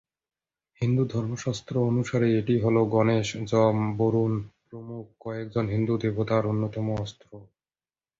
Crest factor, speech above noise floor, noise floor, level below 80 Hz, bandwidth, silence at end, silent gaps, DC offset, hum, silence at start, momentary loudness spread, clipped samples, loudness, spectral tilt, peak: 18 dB; over 65 dB; under -90 dBFS; -56 dBFS; 7.8 kHz; 0.75 s; none; under 0.1%; none; 0.8 s; 15 LU; under 0.1%; -26 LUFS; -7.5 dB/octave; -8 dBFS